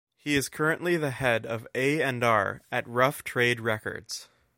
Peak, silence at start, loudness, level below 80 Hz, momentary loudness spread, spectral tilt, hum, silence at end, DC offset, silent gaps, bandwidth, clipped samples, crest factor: -6 dBFS; 0.25 s; -27 LUFS; -60 dBFS; 9 LU; -4.5 dB/octave; none; 0.35 s; under 0.1%; none; 16.5 kHz; under 0.1%; 22 dB